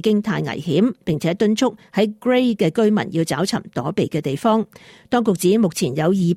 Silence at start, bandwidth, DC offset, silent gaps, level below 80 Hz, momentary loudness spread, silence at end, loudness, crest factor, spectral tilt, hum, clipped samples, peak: 0.05 s; 15.5 kHz; under 0.1%; none; -58 dBFS; 5 LU; 0 s; -19 LUFS; 14 dB; -6 dB/octave; none; under 0.1%; -6 dBFS